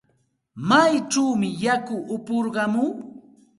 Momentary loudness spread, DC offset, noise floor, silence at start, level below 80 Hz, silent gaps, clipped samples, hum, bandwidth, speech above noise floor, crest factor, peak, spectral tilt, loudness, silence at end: 13 LU; under 0.1%; -68 dBFS; 0.55 s; -66 dBFS; none; under 0.1%; none; 11.5 kHz; 46 dB; 20 dB; -4 dBFS; -4.5 dB/octave; -22 LUFS; 0.4 s